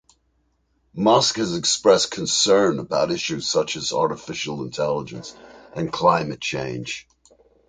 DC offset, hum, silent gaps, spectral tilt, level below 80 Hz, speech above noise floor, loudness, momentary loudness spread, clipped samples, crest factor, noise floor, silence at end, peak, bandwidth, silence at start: under 0.1%; none; none; -3.5 dB/octave; -56 dBFS; 46 dB; -21 LUFS; 15 LU; under 0.1%; 20 dB; -67 dBFS; 0.7 s; -2 dBFS; 9.6 kHz; 0.95 s